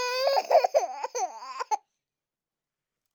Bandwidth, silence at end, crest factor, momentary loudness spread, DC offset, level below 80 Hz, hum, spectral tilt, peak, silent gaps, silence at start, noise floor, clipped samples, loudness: over 20 kHz; 1.35 s; 20 dB; 11 LU; under 0.1%; under -90 dBFS; none; 1.5 dB/octave; -8 dBFS; none; 0 s; under -90 dBFS; under 0.1%; -27 LUFS